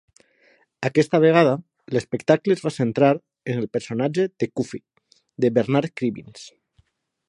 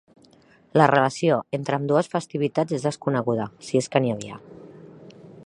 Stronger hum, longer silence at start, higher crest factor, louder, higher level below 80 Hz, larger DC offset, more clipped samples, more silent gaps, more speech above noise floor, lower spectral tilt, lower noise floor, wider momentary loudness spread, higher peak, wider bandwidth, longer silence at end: neither; about the same, 0.8 s vs 0.75 s; about the same, 22 dB vs 24 dB; about the same, -22 LUFS vs -23 LUFS; about the same, -66 dBFS vs -66 dBFS; neither; neither; neither; first, 43 dB vs 33 dB; about the same, -7 dB/octave vs -6 dB/octave; first, -64 dBFS vs -55 dBFS; first, 12 LU vs 9 LU; about the same, -2 dBFS vs 0 dBFS; about the same, 11 kHz vs 11 kHz; first, 0.8 s vs 0.05 s